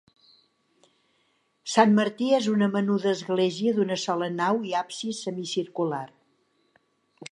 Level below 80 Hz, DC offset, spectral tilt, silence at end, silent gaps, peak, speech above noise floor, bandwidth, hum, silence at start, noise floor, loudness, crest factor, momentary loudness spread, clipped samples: -78 dBFS; under 0.1%; -5 dB/octave; 0.05 s; none; -4 dBFS; 45 dB; 11 kHz; none; 1.65 s; -70 dBFS; -25 LUFS; 22 dB; 11 LU; under 0.1%